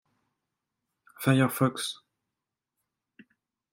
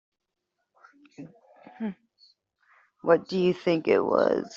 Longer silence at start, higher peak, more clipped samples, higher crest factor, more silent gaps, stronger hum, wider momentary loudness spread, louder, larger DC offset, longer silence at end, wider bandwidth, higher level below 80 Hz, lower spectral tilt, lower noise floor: about the same, 1.2 s vs 1.2 s; second, -10 dBFS vs -6 dBFS; neither; about the same, 22 dB vs 22 dB; neither; neither; second, 11 LU vs 23 LU; about the same, -27 LUFS vs -25 LUFS; neither; first, 1.8 s vs 0 s; first, 16 kHz vs 7.4 kHz; about the same, -72 dBFS vs -70 dBFS; about the same, -5.5 dB/octave vs -5 dB/octave; first, -87 dBFS vs -81 dBFS